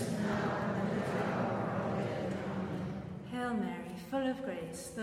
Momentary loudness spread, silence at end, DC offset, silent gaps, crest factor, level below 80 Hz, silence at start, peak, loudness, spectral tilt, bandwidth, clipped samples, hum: 7 LU; 0 s; under 0.1%; none; 12 dB; -62 dBFS; 0 s; -24 dBFS; -36 LUFS; -6.5 dB/octave; 15.5 kHz; under 0.1%; none